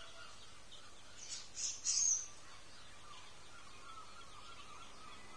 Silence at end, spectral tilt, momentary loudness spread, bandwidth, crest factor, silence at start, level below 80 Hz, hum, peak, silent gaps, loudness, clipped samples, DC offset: 0 s; 1 dB/octave; 23 LU; 11 kHz; 22 dB; 0 s; -70 dBFS; none; -22 dBFS; none; -37 LUFS; under 0.1%; 0.2%